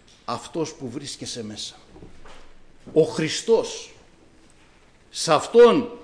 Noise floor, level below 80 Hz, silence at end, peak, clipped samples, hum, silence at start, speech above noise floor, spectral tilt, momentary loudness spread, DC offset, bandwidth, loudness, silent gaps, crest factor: -53 dBFS; -52 dBFS; 0 s; -6 dBFS; under 0.1%; none; 0.3 s; 32 dB; -4 dB/octave; 20 LU; under 0.1%; 10.5 kHz; -22 LUFS; none; 18 dB